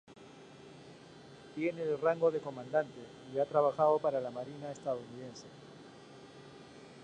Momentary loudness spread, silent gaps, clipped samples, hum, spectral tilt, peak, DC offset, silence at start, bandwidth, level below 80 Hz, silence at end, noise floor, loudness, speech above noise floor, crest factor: 24 LU; none; under 0.1%; none; -6.5 dB/octave; -16 dBFS; under 0.1%; 0.1 s; 9.8 kHz; -76 dBFS; 0 s; -54 dBFS; -34 LUFS; 21 dB; 20 dB